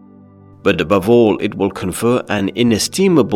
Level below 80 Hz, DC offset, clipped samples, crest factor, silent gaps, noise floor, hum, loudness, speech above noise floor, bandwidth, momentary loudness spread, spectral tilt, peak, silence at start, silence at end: -46 dBFS; under 0.1%; under 0.1%; 14 dB; none; -42 dBFS; none; -15 LUFS; 28 dB; 16.5 kHz; 7 LU; -5 dB/octave; 0 dBFS; 0.65 s; 0 s